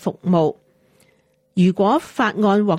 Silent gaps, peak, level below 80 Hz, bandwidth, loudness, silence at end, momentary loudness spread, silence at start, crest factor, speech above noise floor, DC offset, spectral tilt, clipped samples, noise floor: none; -6 dBFS; -62 dBFS; 11 kHz; -19 LUFS; 0 s; 6 LU; 0 s; 14 dB; 43 dB; under 0.1%; -7.5 dB/octave; under 0.1%; -61 dBFS